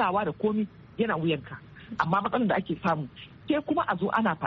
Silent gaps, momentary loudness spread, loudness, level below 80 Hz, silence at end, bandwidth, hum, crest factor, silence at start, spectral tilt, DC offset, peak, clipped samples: none; 14 LU; -28 LUFS; -60 dBFS; 0 s; 6.4 kHz; none; 20 dB; 0 s; -5 dB/octave; under 0.1%; -8 dBFS; under 0.1%